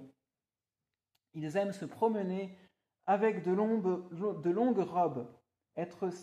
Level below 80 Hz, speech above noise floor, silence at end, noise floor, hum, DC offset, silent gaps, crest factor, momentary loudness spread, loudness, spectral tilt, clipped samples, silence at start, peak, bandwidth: -82 dBFS; over 57 dB; 0 s; under -90 dBFS; none; under 0.1%; none; 16 dB; 13 LU; -34 LUFS; -8 dB/octave; under 0.1%; 0 s; -18 dBFS; 11 kHz